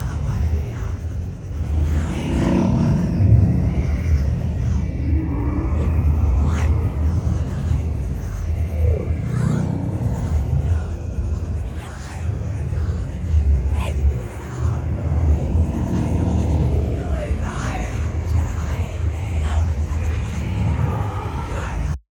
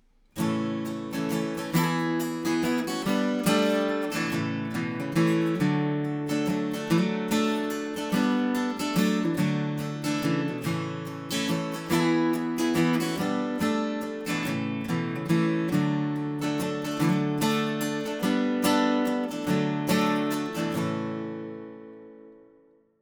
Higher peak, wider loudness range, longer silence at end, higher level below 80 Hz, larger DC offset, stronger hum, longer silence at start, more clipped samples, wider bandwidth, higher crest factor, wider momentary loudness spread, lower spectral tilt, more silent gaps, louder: first, -4 dBFS vs -10 dBFS; about the same, 4 LU vs 2 LU; second, 0.15 s vs 0.65 s; first, -24 dBFS vs -64 dBFS; neither; neither; second, 0 s vs 0.35 s; neither; second, 9.8 kHz vs over 20 kHz; about the same, 16 dB vs 16 dB; about the same, 8 LU vs 7 LU; first, -8 dB/octave vs -5.5 dB/octave; neither; first, -22 LUFS vs -27 LUFS